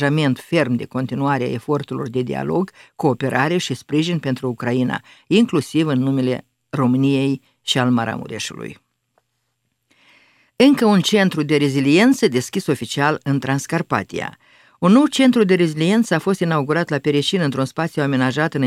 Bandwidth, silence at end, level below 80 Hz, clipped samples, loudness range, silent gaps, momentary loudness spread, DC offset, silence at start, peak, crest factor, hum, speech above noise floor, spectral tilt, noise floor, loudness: 15 kHz; 0 s; -60 dBFS; under 0.1%; 5 LU; none; 10 LU; under 0.1%; 0 s; 0 dBFS; 18 dB; none; 54 dB; -6 dB/octave; -72 dBFS; -18 LUFS